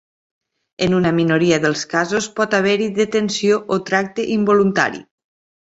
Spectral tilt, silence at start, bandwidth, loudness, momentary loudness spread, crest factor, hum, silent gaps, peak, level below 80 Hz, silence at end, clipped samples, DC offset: -5 dB/octave; 0.8 s; 8 kHz; -17 LUFS; 5 LU; 16 dB; none; none; -2 dBFS; -56 dBFS; 0.75 s; under 0.1%; under 0.1%